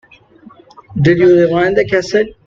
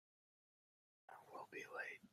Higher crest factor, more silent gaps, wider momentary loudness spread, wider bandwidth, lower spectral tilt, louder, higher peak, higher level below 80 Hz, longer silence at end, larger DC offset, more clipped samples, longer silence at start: second, 12 dB vs 20 dB; neither; second, 7 LU vs 14 LU; second, 7.4 kHz vs 15.5 kHz; first, -7 dB/octave vs -3 dB/octave; first, -12 LUFS vs -52 LUFS; first, 0 dBFS vs -36 dBFS; first, -44 dBFS vs under -90 dBFS; about the same, 0.15 s vs 0.05 s; neither; neither; second, 0.9 s vs 1.1 s